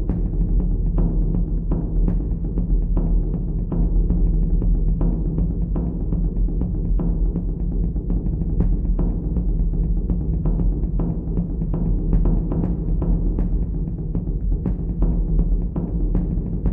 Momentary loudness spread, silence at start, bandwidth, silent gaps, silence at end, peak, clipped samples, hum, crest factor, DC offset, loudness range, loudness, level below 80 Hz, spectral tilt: 3 LU; 0 s; 1.4 kHz; none; 0 s; -6 dBFS; under 0.1%; none; 14 dB; under 0.1%; 1 LU; -24 LUFS; -20 dBFS; -14 dB/octave